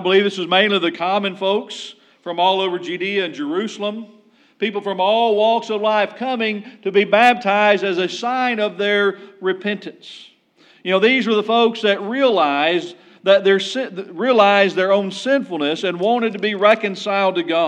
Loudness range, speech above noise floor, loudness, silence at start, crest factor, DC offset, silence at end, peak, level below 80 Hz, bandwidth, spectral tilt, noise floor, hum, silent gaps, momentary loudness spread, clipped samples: 4 LU; 35 dB; -18 LUFS; 0 s; 18 dB; under 0.1%; 0 s; 0 dBFS; -80 dBFS; 9.8 kHz; -4.5 dB/octave; -53 dBFS; none; none; 11 LU; under 0.1%